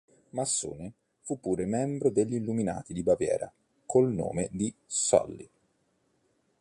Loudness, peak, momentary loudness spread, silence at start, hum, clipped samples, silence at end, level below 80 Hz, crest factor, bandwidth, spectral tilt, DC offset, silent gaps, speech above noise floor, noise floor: -29 LUFS; -8 dBFS; 15 LU; 0.35 s; none; under 0.1%; 1.15 s; -58 dBFS; 22 dB; 11.5 kHz; -5 dB/octave; under 0.1%; none; 44 dB; -72 dBFS